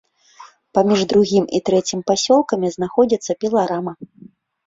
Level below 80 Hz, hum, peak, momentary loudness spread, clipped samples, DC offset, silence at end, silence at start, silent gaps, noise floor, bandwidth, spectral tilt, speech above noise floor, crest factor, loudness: -56 dBFS; none; -2 dBFS; 7 LU; under 0.1%; under 0.1%; 0.6 s; 0.4 s; none; -45 dBFS; 7.8 kHz; -5 dB/octave; 28 dB; 16 dB; -18 LUFS